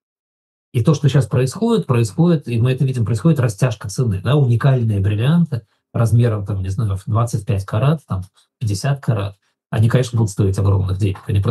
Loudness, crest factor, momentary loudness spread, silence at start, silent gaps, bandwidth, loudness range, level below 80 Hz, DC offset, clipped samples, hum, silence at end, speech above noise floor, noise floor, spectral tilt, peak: -18 LUFS; 16 dB; 7 LU; 0.75 s; none; 12.5 kHz; 3 LU; -52 dBFS; under 0.1%; under 0.1%; none; 0 s; over 73 dB; under -90 dBFS; -7.5 dB/octave; -2 dBFS